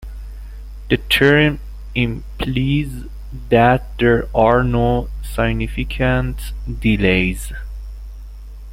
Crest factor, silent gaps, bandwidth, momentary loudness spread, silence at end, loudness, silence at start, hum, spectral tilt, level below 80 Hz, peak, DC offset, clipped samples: 16 dB; none; 16.5 kHz; 22 LU; 0 s; -17 LUFS; 0 s; 50 Hz at -30 dBFS; -6.5 dB/octave; -28 dBFS; -2 dBFS; under 0.1%; under 0.1%